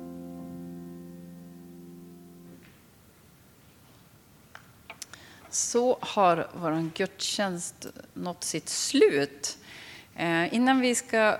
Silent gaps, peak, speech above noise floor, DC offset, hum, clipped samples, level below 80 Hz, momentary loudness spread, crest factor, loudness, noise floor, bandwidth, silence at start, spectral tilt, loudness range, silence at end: none; -8 dBFS; 30 dB; under 0.1%; none; under 0.1%; -68 dBFS; 24 LU; 22 dB; -27 LUFS; -57 dBFS; 19 kHz; 0 s; -3.5 dB/octave; 22 LU; 0 s